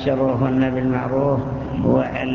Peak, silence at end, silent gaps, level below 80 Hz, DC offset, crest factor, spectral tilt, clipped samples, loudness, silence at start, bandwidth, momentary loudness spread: -4 dBFS; 0 s; none; -40 dBFS; under 0.1%; 16 dB; -9.5 dB/octave; under 0.1%; -20 LUFS; 0 s; 6.6 kHz; 4 LU